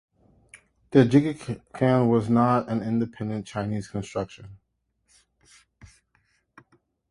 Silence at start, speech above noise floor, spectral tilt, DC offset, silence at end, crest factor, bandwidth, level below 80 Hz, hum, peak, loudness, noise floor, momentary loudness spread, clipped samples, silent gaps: 0.55 s; 49 dB; -8 dB/octave; under 0.1%; 2.55 s; 22 dB; 11 kHz; -56 dBFS; none; -4 dBFS; -24 LUFS; -72 dBFS; 14 LU; under 0.1%; none